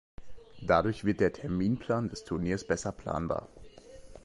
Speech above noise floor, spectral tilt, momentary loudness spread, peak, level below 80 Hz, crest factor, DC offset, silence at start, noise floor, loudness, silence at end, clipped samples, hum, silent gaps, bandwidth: 19 dB; -6.5 dB/octave; 8 LU; -10 dBFS; -50 dBFS; 22 dB; under 0.1%; 0.2 s; -50 dBFS; -31 LUFS; 0.05 s; under 0.1%; none; none; 11.5 kHz